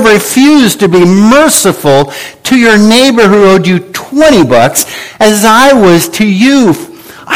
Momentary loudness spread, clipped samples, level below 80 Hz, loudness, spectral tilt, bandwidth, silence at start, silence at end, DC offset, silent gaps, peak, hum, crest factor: 8 LU; 3%; -38 dBFS; -5 LUFS; -4 dB/octave; over 20 kHz; 0 s; 0 s; under 0.1%; none; 0 dBFS; none; 6 dB